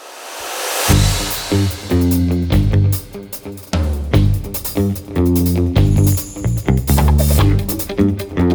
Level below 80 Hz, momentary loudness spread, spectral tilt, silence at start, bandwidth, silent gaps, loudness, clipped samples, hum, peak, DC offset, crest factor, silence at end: -24 dBFS; 9 LU; -5.5 dB/octave; 0 s; over 20 kHz; none; -16 LUFS; under 0.1%; none; 0 dBFS; under 0.1%; 16 dB; 0 s